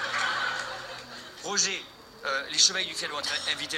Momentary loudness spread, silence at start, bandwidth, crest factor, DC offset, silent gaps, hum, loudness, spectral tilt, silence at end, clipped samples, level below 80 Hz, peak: 18 LU; 0 s; 16 kHz; 24 dB; under 0.1%; none; none; -27 LUFS; 0.5 dB/octave; 0 s; under 0.1%; -68 dBFS; -6 dBFS